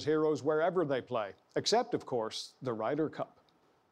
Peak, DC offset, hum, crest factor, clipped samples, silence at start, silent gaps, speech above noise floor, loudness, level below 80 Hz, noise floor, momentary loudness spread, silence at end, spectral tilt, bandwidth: -18 dBFS; under 0.1%; none; 16 dB; under 0.1%; 0 s; none; 36 dB; -33 LUFS; -80 dBFS; -69 dBFS; 9 LU; 0.65 s; -4.5 dB/octave; 12 kHz